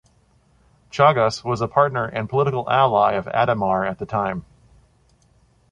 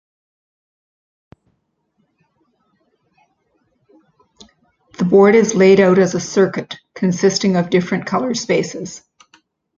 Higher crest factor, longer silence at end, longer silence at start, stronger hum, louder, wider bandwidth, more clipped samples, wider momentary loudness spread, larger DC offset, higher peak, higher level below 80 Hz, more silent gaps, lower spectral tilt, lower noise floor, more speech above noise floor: about the same, 18 dB vs 16 dB; first, 1.3 s vs 0.8 s; second, 0.95 s vs 5 s; neither; second, -20 LUFS vs -15 LUFS; first, 10 kHz vs 7.6 kHz; neither; second, 9 LU vs 17 LU; neither; about the same, -2 dBFS vs -2 dBFS; first, -52 dBFS vs -60 dBFS; neither; about the same, -6 dB/octave vs -5.5 dB/octave; second, -59 dBFS vs -68 dBFS; second, 39 dB vs 53 dB